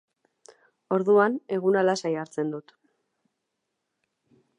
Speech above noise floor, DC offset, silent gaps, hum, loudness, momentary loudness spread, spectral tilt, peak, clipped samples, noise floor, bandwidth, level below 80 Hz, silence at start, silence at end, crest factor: 57 dB; under 0.1%; none; none; -25 LUFS; 11 LU; -6 dB/octave; -8 dBFS; under 0.1%; -81 dBFS; 10 kHz; -84 dBFS; 0.9 s; 2 s; 20 dB